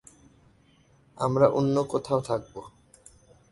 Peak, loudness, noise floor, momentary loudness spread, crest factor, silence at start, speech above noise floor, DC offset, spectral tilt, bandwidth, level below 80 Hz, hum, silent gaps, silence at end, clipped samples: -6 dBFS; -26 LUFS; -61 dBFS; 15 LU; 22 dB; 1.2 s; 36 dB; under 0.1%; -7.5 dB/octave; 11.5 kHz; -60 dBFS; none; none; 0.85 s; under 0.1%